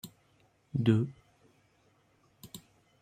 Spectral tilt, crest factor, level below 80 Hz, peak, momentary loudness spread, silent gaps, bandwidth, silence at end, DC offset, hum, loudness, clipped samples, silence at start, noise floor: -7.5 dB/octave; 24 dB; -68 dBFS; -12 dBFS; 23 LU; none; 15 kHz; 0.45 s; under 0.1%; none; -31 LUFS; under 0.1%; 0.05 s; -69 dBFS